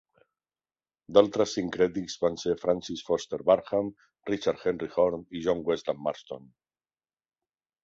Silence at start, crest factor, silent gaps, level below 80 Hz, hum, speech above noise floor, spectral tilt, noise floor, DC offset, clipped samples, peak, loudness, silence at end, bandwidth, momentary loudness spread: 1.1 s; 22 dB; none; -62 dBFS; none; over 62 dB; -5 dB/octave; under -90 dBFS; under 0.1%; under 0.1%; -6 dBFS; -28 LUFS; 1.45 s; 7.8 kHz; 10 LU